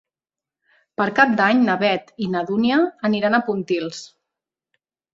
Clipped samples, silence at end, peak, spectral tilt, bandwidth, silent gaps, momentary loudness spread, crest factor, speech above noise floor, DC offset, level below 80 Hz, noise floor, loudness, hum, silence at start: under 0.1%; 1.05 s; -2 dBFS; -5.5 dB/octave; 7.8 kHz; none; 9 LU; 20 dB; 71 dB; under 0.1%; -64 dBFS; -90 dBFS; -19 LUFS; none; 1 s